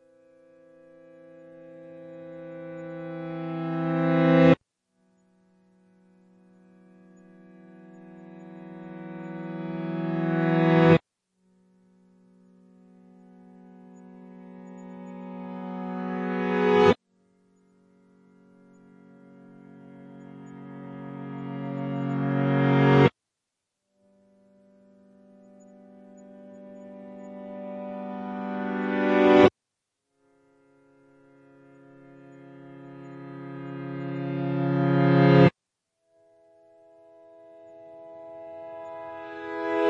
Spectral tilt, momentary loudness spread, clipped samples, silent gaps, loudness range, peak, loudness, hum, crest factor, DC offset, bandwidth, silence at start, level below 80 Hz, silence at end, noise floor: -8.5 dB/octave; 28 LU; under 0.1%; none; 20 LU; -2 dBFS; -24 LUFS; none; 26 dB; under 0.1%; 7.2 kHz; 1.55 s; -66 dBFS; 0 s; -84 dBFS